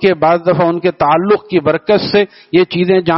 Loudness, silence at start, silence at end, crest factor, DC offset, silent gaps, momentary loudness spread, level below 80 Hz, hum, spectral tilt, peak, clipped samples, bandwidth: -13 LUFS; 0 s; 0 s; 12 dB; under 0.1%; none; 3 LU; -50 dBFS; none; -4.5 dB/octave; 0 dBFS; under 0.1%; 5.8 kHz